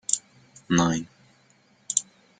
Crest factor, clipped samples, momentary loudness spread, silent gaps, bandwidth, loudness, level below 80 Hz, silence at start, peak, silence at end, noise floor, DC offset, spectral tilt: 26 dB; under 0.1%; 8 LU; none; 9.8 kHz; -26 LUFS; -62 dBFS; 0.1 s; -4 dBFS; 0.4 s; -61 dBFS; under 0.1%; -3.5 dB/octave